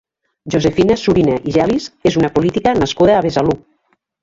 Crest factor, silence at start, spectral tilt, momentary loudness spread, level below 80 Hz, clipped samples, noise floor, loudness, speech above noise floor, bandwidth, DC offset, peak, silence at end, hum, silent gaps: 14 dB; 0.45 s; -6.5 dB/octave; 5 LU; -40 dBFS; under 0.1%; -63 dBFS; -15 LUFS; 49 dB; 7.8 kHz; under 0.1%; -2 dBFS; 0.65 s; none; none